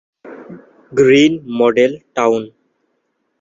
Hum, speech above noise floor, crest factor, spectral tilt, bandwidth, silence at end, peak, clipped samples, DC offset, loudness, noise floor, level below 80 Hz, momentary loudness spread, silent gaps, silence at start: none; 55 dB; 14 dB; -5.5 dB/octave; 7.8 kHz; 0.9 s; -2 dBFS; under 0.1%; under 0.1%; -14 LUFS; -68 dBFS; -58 dBFS; 24 LU; none; 0.25 s